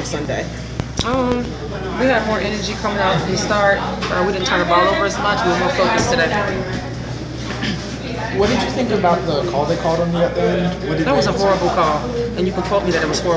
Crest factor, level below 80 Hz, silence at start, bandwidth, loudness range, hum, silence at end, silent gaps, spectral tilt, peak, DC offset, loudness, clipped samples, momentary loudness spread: 16 dB; -34 dBFS; 0 s; 8 kHz; 3 LU; none; 0 s; none; -5 dB/octave; -2 dBFS; under 0.1%; -18 LUFS; under 0.1%; 9 LU